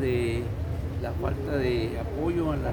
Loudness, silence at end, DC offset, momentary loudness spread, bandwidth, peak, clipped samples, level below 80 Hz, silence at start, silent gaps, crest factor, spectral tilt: -29 LUFS; 0 s; under 0.1%; 5 LU; over 20 kHz; -14 dBFS; under 0.1%; -38 dBFS; 0 s; none; 14 dB; -8 dB/octave